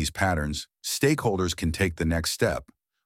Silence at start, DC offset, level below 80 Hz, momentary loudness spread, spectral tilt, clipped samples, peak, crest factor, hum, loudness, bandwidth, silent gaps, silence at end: 0 s; under 0.1%; -40 dBFS; 8 LU; -4.5 dB/octave; under 0.1%; -8 dBFS; 18 dB; none; -26 LUFS; 17 kHz; none; 0.45 s